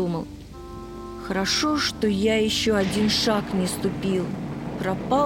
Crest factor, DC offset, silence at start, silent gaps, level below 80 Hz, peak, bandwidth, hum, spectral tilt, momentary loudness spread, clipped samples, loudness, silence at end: 16 dB; under 0.1%; 0 s; none; -44 dBFS; -8 dBFS; 18.5 kHz; none; -4.5 dB/octave; 16 LU; under 0.1%; -23 LUFS; 0 s